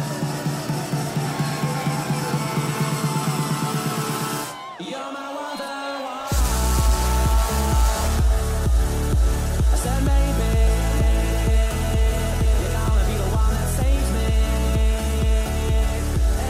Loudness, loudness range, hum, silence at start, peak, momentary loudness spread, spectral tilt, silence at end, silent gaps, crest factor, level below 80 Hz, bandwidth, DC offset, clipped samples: -23 LUFS; 4 LU; none; 0 s; -8 dBFS; 8 LU; -5 dB/octave; 0 s; none; 12 dB; -22 dBFS; 16 kHz; under 0.1%; under 0.1%